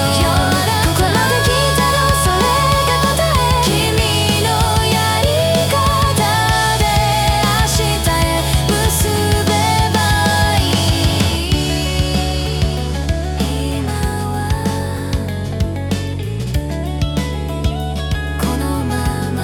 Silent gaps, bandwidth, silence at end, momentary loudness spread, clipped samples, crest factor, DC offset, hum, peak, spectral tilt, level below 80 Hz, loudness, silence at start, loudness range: none; 18 kHz; 0 s; 7 LU; under 0.1%; 12 dB; under 0.1%; none; -4 dBFS; -4.5 dB/octave; -24 dBFS; -15 LUFS; 0 s; 7 LU